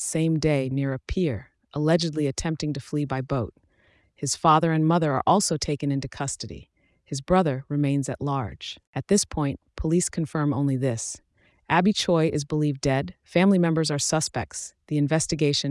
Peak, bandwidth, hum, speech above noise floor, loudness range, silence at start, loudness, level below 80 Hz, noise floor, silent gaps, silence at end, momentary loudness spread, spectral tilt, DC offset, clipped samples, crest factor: -6 dBFS; 12 kHz; none; 39 dB; 3 LU; 0 s; -25 LUFS; -48 dBFS; -63 dBFS; 8.87-8.93 s; 0 s; 13 LU; -5 dB/octave; under 0.1%; under 0.1%; 18 dB